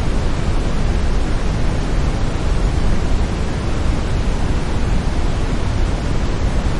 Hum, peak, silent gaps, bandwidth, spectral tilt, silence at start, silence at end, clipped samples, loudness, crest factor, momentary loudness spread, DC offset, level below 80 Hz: none; -4 dBFS; none; 11 kHz; -6 dB/octave; 0 s; 0 s; under 0.1%; -21 LUFS; 12 dB; 1 LU; under 0.1%; -18 dBFS